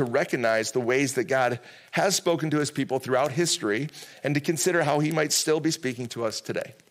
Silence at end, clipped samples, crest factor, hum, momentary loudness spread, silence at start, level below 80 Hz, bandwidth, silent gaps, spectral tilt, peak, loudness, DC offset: 0.2 s; under 0.1%; 16 dB; none; 8 LU; 0 s; -72 dBFS; 16.5 kHz; none; -4 dB/octave; -10 dBFS; -25 LUFS; under 0.1%